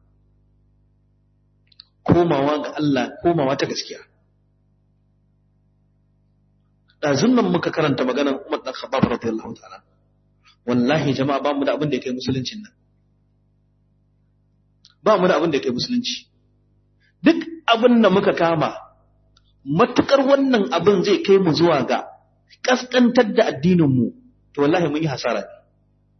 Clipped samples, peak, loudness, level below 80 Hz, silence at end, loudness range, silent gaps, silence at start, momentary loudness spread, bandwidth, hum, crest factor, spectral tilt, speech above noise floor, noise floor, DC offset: under 0.1%; -2 dBFS; -19 LUFS; -58 dBFS; 0.65 s; 8 LU; none; 2.05 s; 11 LU; 6.4 kHz; 50 Hz at -50 dBFS; 20 dB; -6 dB/octave; 43 dB; -61 dBFS; under 0.1%